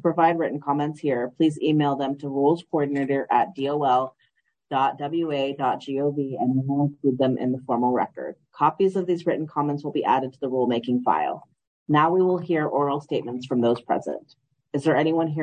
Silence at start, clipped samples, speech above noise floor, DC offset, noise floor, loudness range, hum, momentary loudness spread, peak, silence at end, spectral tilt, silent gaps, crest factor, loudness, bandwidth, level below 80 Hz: 0.05 s; under 0.1%; 46 dB; under 0.1%; -69 dBFS; 2 LU; none; 6 LU; -6 dBFS; 0 s; -8 dB/octave; 11.67-11.86 s; 18 dB; -24 LUFS; 9.6 kHz; -72 dBFS